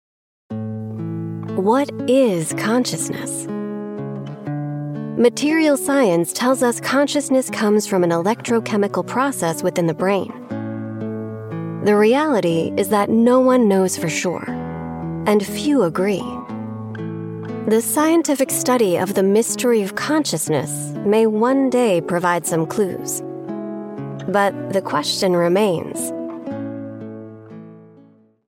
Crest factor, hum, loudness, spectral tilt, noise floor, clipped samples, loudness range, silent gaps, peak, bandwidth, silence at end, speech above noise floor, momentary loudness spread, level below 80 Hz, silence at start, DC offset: 16 dB; none; -19 LUFS; -5 dB/octave; -50 dBFS; under 0.1%; 4 LU; none; -4 dBFS; 17 kHz; 0.6 s; 33 dB; 13 LU; -60 dBFS; 0.5 s; under 0.1%